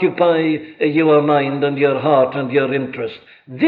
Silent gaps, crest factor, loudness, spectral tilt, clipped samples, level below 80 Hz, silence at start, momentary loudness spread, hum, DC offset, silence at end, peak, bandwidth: none; 14 dB; -16 LUFS; -9.5 dB/octave; under 0.1%; -66 dBFS; 0 s; 11 LU; none; under 0.1%; 0 s; -2 dBFS; 4.7 kHz